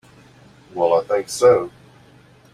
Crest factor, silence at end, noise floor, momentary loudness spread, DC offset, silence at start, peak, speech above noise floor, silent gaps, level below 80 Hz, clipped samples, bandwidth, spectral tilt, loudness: 18 dB; 0.85 s; -50 dBFS; 16 LU; under 0.1%; 0.75 s; -2 dBFS; 32 dB; none; -60 dBFS; under 0.1%; 14.5 kHz; -4.5 dB/octave; -18 LUFS